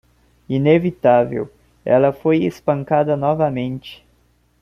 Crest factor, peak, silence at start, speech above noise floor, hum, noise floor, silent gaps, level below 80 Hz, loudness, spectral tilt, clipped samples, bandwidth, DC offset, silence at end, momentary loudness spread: 16 dB; -2 dBFS; 0.5 s; 42 dB; none; -59 dBFS; none; -54 dBFS; -18 LUFS; -8.5 dB/octave; under 0.1%; 7 kHz; under 0.1%; 0.7 s; 14 LU